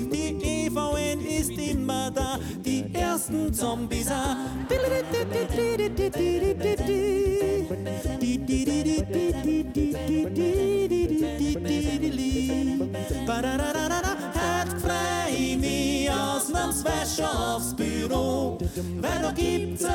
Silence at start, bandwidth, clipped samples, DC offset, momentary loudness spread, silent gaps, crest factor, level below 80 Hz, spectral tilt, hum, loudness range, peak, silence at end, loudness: 0 s; 18.5 kHz; under 0.1%; under 0.1%; 4 LU; none; 12 dB; -38 dBFS; -5 dB/octave; none; 2 LU; -14 dBFS; 0 s; -26 LUFS